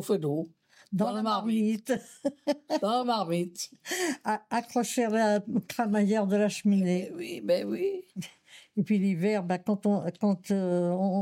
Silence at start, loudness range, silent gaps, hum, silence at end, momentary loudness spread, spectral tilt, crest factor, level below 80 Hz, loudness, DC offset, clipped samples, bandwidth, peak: 0 s; 2 LU; none; none; 0 s; 10 LU; -6 dB/octave; 14 dB; -78 dBFS; -29 LUFS; under 0.1%; under 0.1%; 16 kHz; -16 dBFS